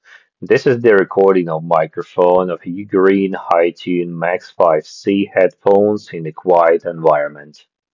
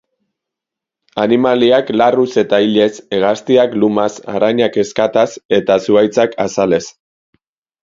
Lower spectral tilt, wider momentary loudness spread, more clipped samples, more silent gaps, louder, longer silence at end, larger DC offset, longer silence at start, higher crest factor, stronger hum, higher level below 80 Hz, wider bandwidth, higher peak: first, -7.5 dB/octave vs -5 dB/octave; first, 9 LU vs 5 LU; neither; second, none vs 5.45-5.49 s; about the same, -15 LUFS vs -14 LUFS; second, 0.5 s vs 0.95 s; neither; second, 0.4 s vs 1.15 s; about the same, 14 dB vs 14 dB; neither; about the same, -60 dBFS vs -56 dBFS; about the same, 7.4 kHz vs 7.8 kHz; about the same, 0 dBFS vs 0 dBFS